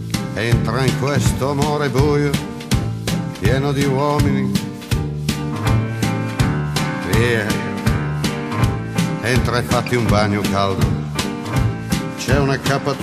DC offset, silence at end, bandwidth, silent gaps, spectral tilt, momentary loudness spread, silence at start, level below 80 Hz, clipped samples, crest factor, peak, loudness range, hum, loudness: under 0.1%; 0 s; 15 kHz; none; -5.5 dB/octave; 6 LU; 0 s; -32 dBFS; under 0.1%; 16 dB; -2 dBFS; 1 LU; none; -19 LUFS